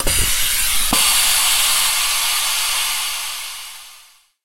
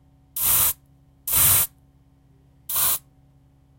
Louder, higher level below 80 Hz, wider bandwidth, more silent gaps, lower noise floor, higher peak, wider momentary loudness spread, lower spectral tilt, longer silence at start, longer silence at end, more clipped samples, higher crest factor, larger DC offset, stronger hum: first, -15 LUFS vs -19 LUFS; first, -32 dBFS vs -48 dBFS; about the same, 16 kHz vs 16.5 kHz; neither; second, -48 dBFS vs -56 dBFS; about the same, -2 dBFS vs -4 dBFS; second, 14 LU vs 17 LU; about the same, 0.5 dB/octave vs -0.5 dB/octave; second, 0 s vs 0.35 s; second, 0 s vs 0.8 s; neither; second, 16 dB vs 22 dB; first, 3% vs under 0.1%; neither